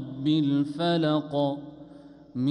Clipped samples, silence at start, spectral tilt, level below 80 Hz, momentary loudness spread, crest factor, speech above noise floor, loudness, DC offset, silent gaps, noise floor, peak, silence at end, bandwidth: under 0.1%; 0 s; -8 dB/octave; -66 dBFS; 16 LU; 12 dB; 24 dB; -26 LUFS; under 0.1%; none; -49 dBFS; -14 dBFS; 0 s; 9.8 kHz